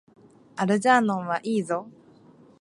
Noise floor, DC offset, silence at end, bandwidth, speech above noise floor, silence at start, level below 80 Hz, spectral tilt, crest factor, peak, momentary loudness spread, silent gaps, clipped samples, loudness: -54 dBFS; under 0.1%; 0.7 s; 11.5 kHz; 30 dB; 0.55 s; -74 dBFS; -5.5 dB/octave; 20 dB; -6 dBFS; 11 LU; none; under 0.1%; -24 LUFS